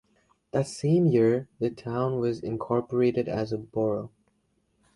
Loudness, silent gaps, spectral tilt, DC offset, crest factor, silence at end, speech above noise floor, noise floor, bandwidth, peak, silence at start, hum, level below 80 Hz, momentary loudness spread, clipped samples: -27 LUFS; none; -8 dB/octave; under 0.1%; 16 dB; 0.85 s; 45 dB; -71 dBFS; 11.5 kHz; -10 dBFS; 0.55 s; none; -60 dBFS; 10 LU; under 0.1%